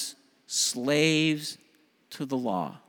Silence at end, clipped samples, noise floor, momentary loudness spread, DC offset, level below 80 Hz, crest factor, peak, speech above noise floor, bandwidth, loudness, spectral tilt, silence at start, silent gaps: 0.1 s; under 0.1%; -64 dBFS; 16 LU; under 0.1%; -76 dBFS; 18 dB; -10 dBFS; 37 dB; 19.5 kHz; -27 LUFS; -3.5 dB/octave; 0 s; none